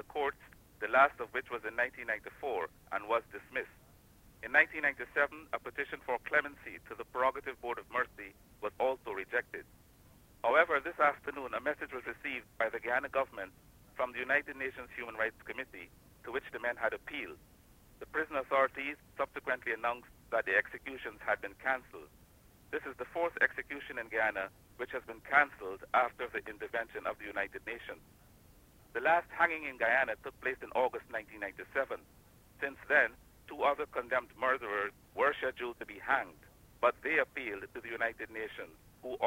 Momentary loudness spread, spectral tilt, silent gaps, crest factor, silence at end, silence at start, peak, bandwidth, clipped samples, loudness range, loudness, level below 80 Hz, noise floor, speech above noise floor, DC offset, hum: 14 LU; -4.5 dB/octave; none; 24 dB; 0 s; 0.1 s; -12 dBFS; 16 kHz; under 0.1%; 4 LU; -35 LUFS; -66 dBFS; -62 dBFS; 26 dB; under 0.1%; none